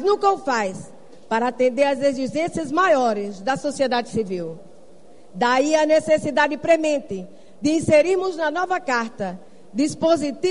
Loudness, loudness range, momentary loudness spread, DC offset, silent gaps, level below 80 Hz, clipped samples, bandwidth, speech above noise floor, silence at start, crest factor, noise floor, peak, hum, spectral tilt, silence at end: -21 LUFS; 3 LU; 12 LU; 0.7%; none; -58 dBFS; under 0.1%; 11 kHz; 29 dB; 0 s; 18 dB; -50 dBFS; -4 dBFS; none; -4.5 dB/octave; 0 s